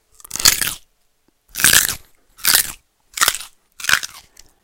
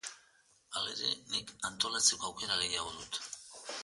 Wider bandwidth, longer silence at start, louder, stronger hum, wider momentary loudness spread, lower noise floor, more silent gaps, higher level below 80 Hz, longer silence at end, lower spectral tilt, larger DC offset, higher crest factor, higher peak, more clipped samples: first, over 20 kHz vs 12 kHz; first, 0.35 s vs 0.05 s; first, -15 LUFS vs -34 LUFS; neither; first, 20 LU vs 15 LU; second, -62 dBFS vs -68 dBFS; neither; first, -46 dBFS vs -68 dBFS; first, 0.45 s vs 0 s; about the same, 1 dB/octave vs 0.5 dB/octave; neither; second, 20 dB vs 26 dB; first, 0 dBFS vs -12 dBFS; first, 0.1% vs under 0.1%